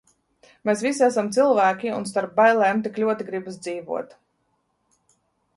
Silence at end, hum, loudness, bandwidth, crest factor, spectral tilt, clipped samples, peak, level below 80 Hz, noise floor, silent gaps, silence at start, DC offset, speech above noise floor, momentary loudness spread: 1.5 s; none; -22 LUFS; 11.5 kHz; 18 dB; -4.5 dB/octave; under 0.1%; -6 dBFS; -70 dBFS; -71 dBFS; none; 0.65 s; under 0.1%; 49 dB; 14 LU